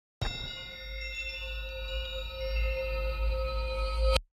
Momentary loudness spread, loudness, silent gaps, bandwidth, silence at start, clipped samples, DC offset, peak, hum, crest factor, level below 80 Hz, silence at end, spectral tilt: 7 LU; -34 LUFS; none; 14 kHz; 0.2 s; under 0.1%; under 0.1%; -8 dBFS; none; 24 dB; -34 dBFS; 0.1 s; -4.5 dB/octave